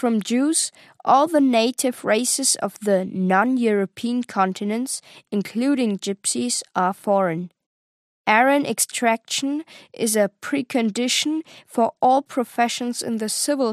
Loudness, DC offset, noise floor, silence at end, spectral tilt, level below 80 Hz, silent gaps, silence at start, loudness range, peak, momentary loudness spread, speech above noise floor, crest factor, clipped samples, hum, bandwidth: -21 LUFS; under 0.1%; under -90 dBFS; 0 s; -3.5 dB/octave; -78 dBFS; 7.66-8.25 s; 0 s; 4 LU; -2 dBFS; 9 LU; over 69 dB; 20 dB; under 0.1%; none; 15 kHz